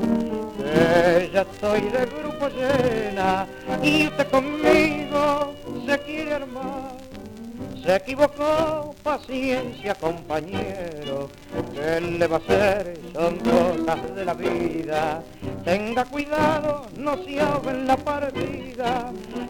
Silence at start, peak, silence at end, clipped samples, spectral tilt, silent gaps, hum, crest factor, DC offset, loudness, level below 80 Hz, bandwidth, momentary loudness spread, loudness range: 0 s; -4 dBFS; 0 s; under 0.1%; -5.5 dB/octave; none; none; 20 dB; under 0.1%; -23 LUFS; -46 dBFS; 20 kHz; 12 LU; 5 LU